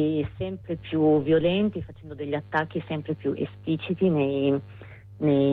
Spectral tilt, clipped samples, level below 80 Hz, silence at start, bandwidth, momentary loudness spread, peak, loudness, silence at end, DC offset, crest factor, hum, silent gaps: -10 dB/octave; under 0.1%; -54 dBFS; 0 s; 4.6 kHz; 15 LU; -10 dBFS; -26 LUFS; 0 s; under 0.1%; 14 dB; none; none